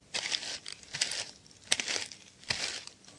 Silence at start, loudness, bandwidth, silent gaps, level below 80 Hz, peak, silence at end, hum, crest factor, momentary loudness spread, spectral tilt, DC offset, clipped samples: 0.1 s; -34 LUFS; 11.5 kHz; none; -70 dBFS; -4 dBFS; 0 s; none; 32 dB; 13 LU; 0.5 dB/octave; under 0.1%; under 0.1%